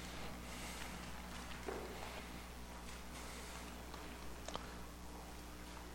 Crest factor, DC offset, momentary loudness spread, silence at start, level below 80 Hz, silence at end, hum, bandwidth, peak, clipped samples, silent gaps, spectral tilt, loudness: 22 dB; under 0.1%; 5 LU; 0 s; -56 dBFS; 0 s; 60 Hz at -55 dBFS; 16.5 kHz; -26 dBFS; under 0.1%; none; -3.5 dB/octave; -50 LUFS